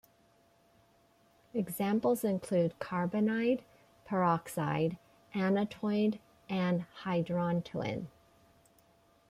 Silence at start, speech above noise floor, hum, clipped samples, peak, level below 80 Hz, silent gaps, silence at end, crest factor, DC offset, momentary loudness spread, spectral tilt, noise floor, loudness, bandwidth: 1.55 s; 35 dB; none; under 0.1%; -18 dBFS; -70 dBFS; none; 1.2 s; 16 dB; under 0.1%; 8 LU; -7 dB/octave; -67 dBFS; -33 LUFS; 15.5 kHz